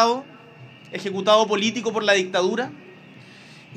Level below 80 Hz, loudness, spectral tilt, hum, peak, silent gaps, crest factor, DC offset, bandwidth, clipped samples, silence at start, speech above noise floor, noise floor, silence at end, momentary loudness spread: -76 dBFS; -21 LUFS; -3.5 dB/octave; none; -4 dBFS; none; 20 dB; under 0.1%; 13 kHz; under 0.1%; 0 s; 25 dB; -46 dBFS; 0 s; 13 LU